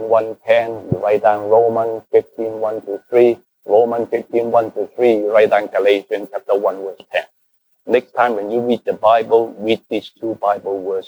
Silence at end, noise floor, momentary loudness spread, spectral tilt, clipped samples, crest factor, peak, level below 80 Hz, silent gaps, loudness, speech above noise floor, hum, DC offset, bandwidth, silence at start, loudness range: 0 s; -63 dBFS; 10 LU; -7 dB/octave; under 0.1%; 16 dB; 0 dBFS; -60 dBFS; none; -17 LUFS; 46 dB; none; under 0.1%; over 20 kHz; 0 s; 3 LU